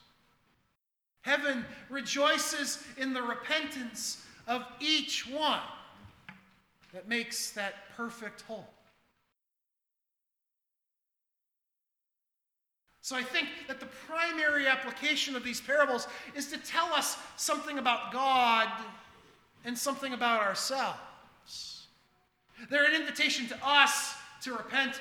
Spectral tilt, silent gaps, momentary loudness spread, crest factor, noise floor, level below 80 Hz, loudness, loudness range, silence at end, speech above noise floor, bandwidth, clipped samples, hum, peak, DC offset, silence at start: -1 dB/octave; none; 16 LU; 26 dB; -87 dBFS; -74 dBFS; -30 LUFS; 10 LU; 0 s; 56 dB; 19.5 kHz; under 0.1%; none; -6 dBFS; under 0.1%; 1.25 s